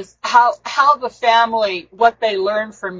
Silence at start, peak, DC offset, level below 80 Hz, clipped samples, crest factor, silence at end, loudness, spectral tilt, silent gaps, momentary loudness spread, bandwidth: 0 s; 0 dBFS; under 0.1%; -60 dBFS; under 0.1%; 16 dB; 0 s; -16 LUFS; -2.5 dB/octave; none; 6 LU; 7.8 kHz